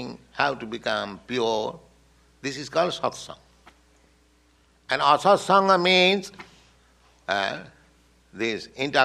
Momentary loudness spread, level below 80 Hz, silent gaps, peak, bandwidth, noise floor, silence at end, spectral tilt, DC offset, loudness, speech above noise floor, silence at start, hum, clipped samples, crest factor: 17 LU; -62 dBFS; none; -4 dBFS; 13 kHz; -61 dBFS; 0 s; -4 dB/octave; under 0.1%; -23 LUFS; 38 dB; 0 s; none; under 0.1%; 22 dB